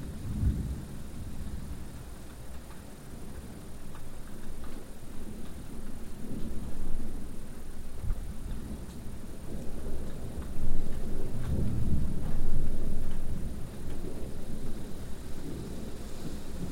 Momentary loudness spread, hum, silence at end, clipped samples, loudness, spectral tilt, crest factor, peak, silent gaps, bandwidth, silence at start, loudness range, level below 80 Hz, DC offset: 13 LU; none; 0 s; under 0.1%; -40 LUFS; -6.5 dB/octave; 16 dB; -10 dBFS; none; 10 kHz; 0 s; 10 LU; -32 dBFS; 0.2%